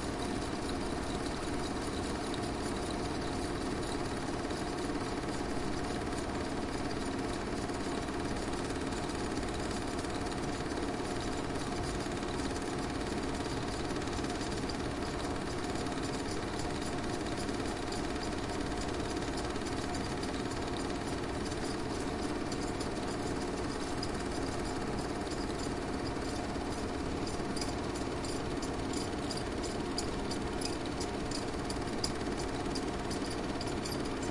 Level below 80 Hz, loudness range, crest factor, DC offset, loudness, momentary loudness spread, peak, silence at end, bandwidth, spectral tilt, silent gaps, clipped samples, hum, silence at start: -46 dBFS; 0 LU; 18 dB; under 0.1%; -36 LUFS; 1 LU; -18 dBFS; 0 s; 12 kHz; -4.5 dB/octave; none; under 0.1%; none; 0 s